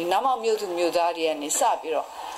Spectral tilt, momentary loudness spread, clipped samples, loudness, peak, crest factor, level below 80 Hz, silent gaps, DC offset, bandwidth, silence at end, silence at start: -1.5 dB/octave; 5 LU; under 0.1%; -24 LUFS; -10 dBFS; 14 dB; -68 dBFS; none; under 0.1%; 16 kHz; 0 s; 0 s